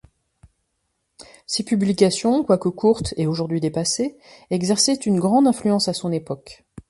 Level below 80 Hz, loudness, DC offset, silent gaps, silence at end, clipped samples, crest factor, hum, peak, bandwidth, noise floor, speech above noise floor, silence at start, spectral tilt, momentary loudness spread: -50 dBFS; -20 LUFS; under 0.1%; none; 0.1 s; under 0.1%; 18 dB; none; -2 dBFS; 11.5 kHz; -73 dBFS; 53 dB; 1.2 s; -5 dB/octave; 10 LU